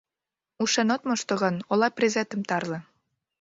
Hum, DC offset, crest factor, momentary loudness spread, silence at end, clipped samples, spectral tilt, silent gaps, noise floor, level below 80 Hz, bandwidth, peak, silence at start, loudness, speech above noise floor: none; under 0.1%; 18 dB; 6 LU; 0.6 s; under 0.1%; -4 dB/octave; none; -89 dBFS; -72 dBFS; 8 kHz; -8 dBFS; 0.6 s; -26 LUFS; 64 dB